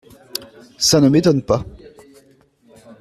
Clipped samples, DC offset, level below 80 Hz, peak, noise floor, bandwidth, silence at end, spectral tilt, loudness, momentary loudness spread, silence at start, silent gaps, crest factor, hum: under 0.1%; under 0.1%; -46 dBFS; -2 dBFS; -54 dBFS; 15.5 kHz; 1.3 s; -5 dB/octave; -15 LUFS; 18 LU; 0.35 s; none; 16 dB; none